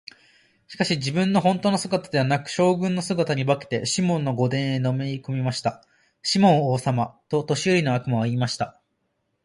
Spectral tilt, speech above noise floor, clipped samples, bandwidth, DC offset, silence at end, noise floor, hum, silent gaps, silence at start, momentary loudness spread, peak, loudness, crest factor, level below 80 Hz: -5.5 dB/octave; 51 dB; under 0.1%; 11.5 kHz; under 0.1%; 0.75 s; -74 dBFS; none; none; 0.7 s; 7 LU; -6 dBFS; -23 LUFS; 18 dB; -62 dBFS